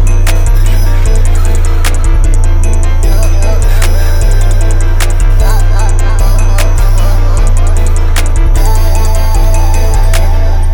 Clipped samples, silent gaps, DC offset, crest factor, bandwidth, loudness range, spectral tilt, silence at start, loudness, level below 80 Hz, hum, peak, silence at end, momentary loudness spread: under 0.1%; none; under 0.1%; 4 dB; 17.5 kHz; 0 LU; -5 dB/octave; 0 s; -12 LUFS; -6 dBFS; none; 0 dBFS; 0 s; 1 LU